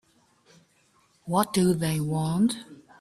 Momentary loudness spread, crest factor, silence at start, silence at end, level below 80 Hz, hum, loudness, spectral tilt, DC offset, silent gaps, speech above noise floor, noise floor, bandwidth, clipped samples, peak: 9 LU; 18 dB; 1.25 s; 0.25 s; -60 dBFS; none; -26 LUFS; -6 dB/octave; under 0.1%; none; 40 dB; -65 dBFS; 15.5 kHz; under 0.1%; -8 dBFS